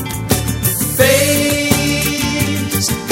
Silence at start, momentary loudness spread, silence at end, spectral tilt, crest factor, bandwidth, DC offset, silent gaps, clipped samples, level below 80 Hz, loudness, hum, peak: 0 s; 6 LU; 0 s; -3.5 dB/octave; 16 dB; 16.5 kHz; under 0.1%; none; under 0.1%; -32 dBFS; -14 LUFS; none; 0 dBFS